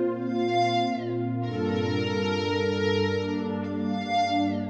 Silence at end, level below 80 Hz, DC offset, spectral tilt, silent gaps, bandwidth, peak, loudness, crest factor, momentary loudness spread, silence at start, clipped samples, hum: 0 s; -68 dBFS; under 0.1%; -6.5 dB/octave; none; 8.4 kHz; -14 dBFS; -27 LUFS; 12 dB; 5 LU; 0 s; under 0.1%; none